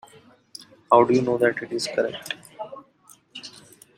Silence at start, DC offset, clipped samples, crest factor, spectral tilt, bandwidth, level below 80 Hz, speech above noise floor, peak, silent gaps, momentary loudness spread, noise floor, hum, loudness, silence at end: 0.6 s; under 0.1%; under 0.1%; 22 dB; -5 dB/octave; 15.5 kHz; -66 dBFS; 34 dB; -4 dBFS; none; 25 LU; -55 dBFS; none; -22 LUFS; 0.4 s